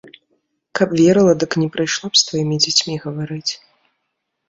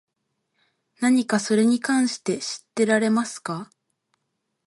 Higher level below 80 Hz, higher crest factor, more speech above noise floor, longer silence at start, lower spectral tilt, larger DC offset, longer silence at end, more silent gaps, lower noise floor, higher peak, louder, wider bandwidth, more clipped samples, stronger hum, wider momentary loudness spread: first, -56 dBFS vs -74 dBFS; about the same, 18 dB vs 18 dB; about the same, 58 dB vs 55 dB; second, 0.75 s vs 1 s; about the same, -4 dB/octave vs -4.5 dB/octave; neither; about the same, 0.95 s vs 1.05 s; neither; about the same, -74 dBFS vs -77 dBFS; first, -2 dBFS vs -8 dBFS; first, -16 LUFS vs -22 LUFS; second, 8 kHz vs 11.5 kHz; neither; neither; about the same, 12 LU vs 10 LU